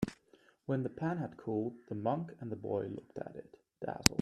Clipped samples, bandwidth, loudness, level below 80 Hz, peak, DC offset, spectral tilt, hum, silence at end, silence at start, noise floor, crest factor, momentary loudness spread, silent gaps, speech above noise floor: under 0.1%; 15.5 kHz; -38 LUFS; -58 dBFS; 0 dBFS; under 0.1%; -4.5 dB/octave; none; 0 s; 0 s; -67 dBFS; 36 dB; 12 LU; none; 30 dB